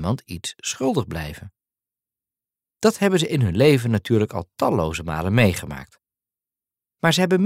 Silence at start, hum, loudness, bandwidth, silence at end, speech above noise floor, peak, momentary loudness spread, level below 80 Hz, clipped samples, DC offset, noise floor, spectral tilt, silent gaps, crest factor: 0 s; none; -21 LUFS; 16 kHz; 0 s; over 70 dB; -4 dBFS; 14 LU; -46 dBFS; under 0.1%; under 0.1%; under -90 dBFS; -5.5 dB/octave; none; 20 dB